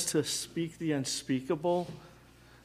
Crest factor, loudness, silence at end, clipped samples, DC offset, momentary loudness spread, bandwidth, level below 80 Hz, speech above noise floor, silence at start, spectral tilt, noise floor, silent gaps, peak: 18 dB; -33 LUFS; 0.1 s; under 0.1%; under 0.1%; 7 LU; 15.5 kHz; -64 dBFS; 24 dB; 0 s; -4 dB/octave; -57 dBFS; none; -16 dBFS